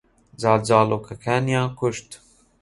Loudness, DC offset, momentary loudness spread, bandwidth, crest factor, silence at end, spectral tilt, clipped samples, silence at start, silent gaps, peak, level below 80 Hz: -21 LUFS; under 0.1%; 9 LU; 11.5 kHz; 20 dB; 0.45 s; -6 dB/octave; under 0.1%; 0.4 s; none; -2 dBFS; -54 dBFS